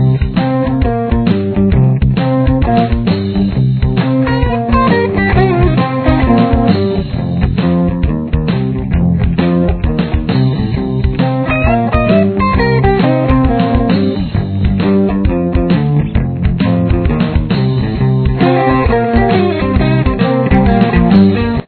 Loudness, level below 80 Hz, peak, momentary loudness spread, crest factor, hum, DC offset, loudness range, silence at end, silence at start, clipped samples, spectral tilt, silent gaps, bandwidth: -12 LUFS; -20 dBFS; 0 dBFS; 5 LU; 10 dB; none; under 0.1%; 2 LU; 0.05 s; 0 s; 0.1%; -11.5 dB/octave; none; 4.5 kHz